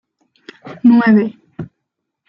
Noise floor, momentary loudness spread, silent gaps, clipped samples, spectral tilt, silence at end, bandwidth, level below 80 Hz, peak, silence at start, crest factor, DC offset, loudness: -76 dBFS; 23 LU; none; under 0.1%; -9.5 dB/octave; 0.65 s; 5.6 kHz; -60 dBFS; -2 dBFS; 0.65 s; 14 dB; under 0.1%; -13 LUFS